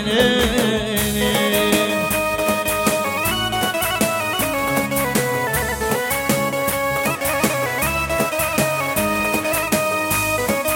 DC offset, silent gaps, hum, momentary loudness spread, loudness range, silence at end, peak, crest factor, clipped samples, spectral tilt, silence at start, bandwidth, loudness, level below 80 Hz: under 0.1%; none; none; 3 LU; 1 LU; 0 s; -2 dBFS; 16 dB; under 0.1%; -3.5 dB/octave; 0 s; 17 kHz; -19 LUFS; -38 dBFS